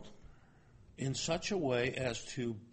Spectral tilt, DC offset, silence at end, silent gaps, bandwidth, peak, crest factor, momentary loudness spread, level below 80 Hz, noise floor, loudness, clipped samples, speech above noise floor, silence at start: -4.5 dB/octave; under 0.1%; 0 s; none; 8.4 kHz; -20 dBFS; 18 dB; 7 LU; -60 dBFS; -61 dBFS; -36 LUFS; under 0.1%; 25 dB; 0 s